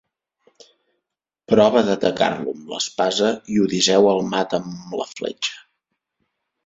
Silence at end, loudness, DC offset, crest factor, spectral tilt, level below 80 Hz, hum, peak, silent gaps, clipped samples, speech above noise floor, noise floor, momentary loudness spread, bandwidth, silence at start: 1.05 s; -20 LUFS; under 0.1%; 20 dB; -4 dB/octave; -60 dBFS; none; -2 dBFS; none; under 0.1%; 63 dB; -82 dBFS; 13 LU; 8 kHz; 1.5 s